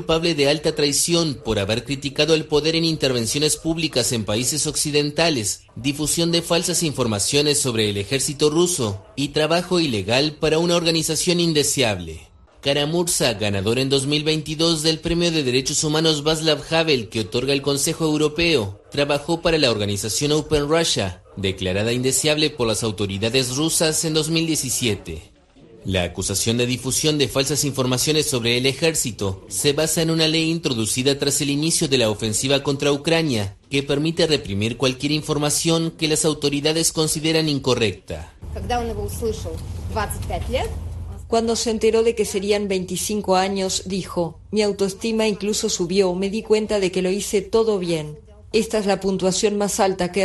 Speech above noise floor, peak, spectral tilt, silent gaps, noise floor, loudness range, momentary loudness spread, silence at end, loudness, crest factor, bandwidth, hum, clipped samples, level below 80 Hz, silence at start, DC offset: 27 dB; -4 dBFS; -3.5 dB/octave; none; -48 dBFS; 3 LU; 7 LU; 0 s; -20 LUFS; 18 dB; 12.5 kHz; none; under 0.1%; -42 dBFS; 0 s; under 0.1%